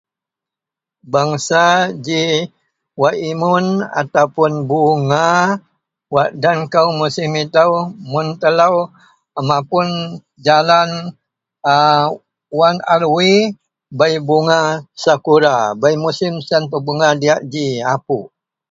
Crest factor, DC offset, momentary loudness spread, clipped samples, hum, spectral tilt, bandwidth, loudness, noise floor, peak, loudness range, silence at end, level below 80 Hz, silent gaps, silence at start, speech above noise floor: 16 dB; under 0.1%; 9 LU; under 0.1%; none; -5 dB/octave; 7.8 kHz; -15 LUFS; -86 dBFS; 0 dBFS; 2 LU; 0.45 s; -60 dBFS; none; 1.05 s; 72 dB